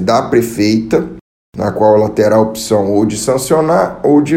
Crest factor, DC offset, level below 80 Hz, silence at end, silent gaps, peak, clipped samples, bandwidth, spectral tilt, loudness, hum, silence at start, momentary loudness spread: 12 dB; under 0.1%; -44 dBFS; 0 s; 1.21-1.53 s; 0 dBFS; under 0.1%; 16.5 kHz; -5.5 dB/octave; -12 LUFS; none; 0 s; 6 LU